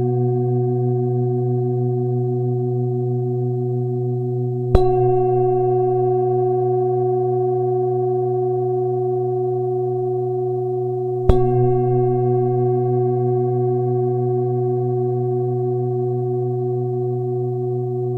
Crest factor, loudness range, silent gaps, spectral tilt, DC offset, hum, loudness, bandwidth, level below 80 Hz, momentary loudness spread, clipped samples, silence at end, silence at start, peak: 18 dB; 3 LU; none; -12 dB/octave; under 0.1%; none; -20 LUFS; 4.2 kHz; -36 dBFS; 5 LU; under 0.1%; 0 s; 0 s; 0 dBFS